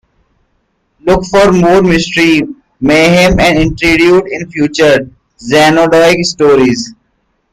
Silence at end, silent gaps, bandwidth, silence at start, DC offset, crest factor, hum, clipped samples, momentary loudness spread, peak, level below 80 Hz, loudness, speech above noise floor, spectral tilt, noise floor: 0.6 s; none; 15.5 kHz; 1.05 s; under 0.1%; 10 dB; none; under 0.1%; 11 LU; 0 dBFS; -28 dBFS; -8 LUFS; 52 dB; -5 dB/octave; -60 dBFS